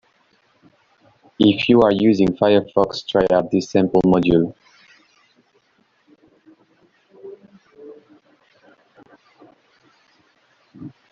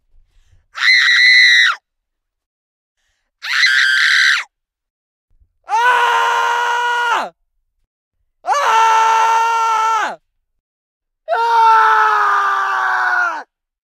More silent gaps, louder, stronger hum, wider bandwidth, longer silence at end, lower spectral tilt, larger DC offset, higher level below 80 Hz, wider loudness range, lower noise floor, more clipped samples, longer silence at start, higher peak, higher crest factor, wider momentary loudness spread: second, none vs 2.46-2.95 s, 4.90-5.28 s, 7.87-8.11 s, 10.60-11.00 s; second, -17 LUFS vs -12 LUFS; neither; second, 7.4 kHz vs 16 kHz; second, 0.25 s vs 0.45 s; first, -5.5 dB/octave vs 2.5 dB/octave; neither; first, -50 dBFS vs -64 dBFS; about the same, 7 LU vs 5 LU; second, -62 dBFS vs -75 dBFS; neither; first, 1.4 s vs 0.75 s; about the same, -2 dBFS vs 0 dBFS; about the same, 18 dB vs 16 dB; first, 26 LU vs 12 LU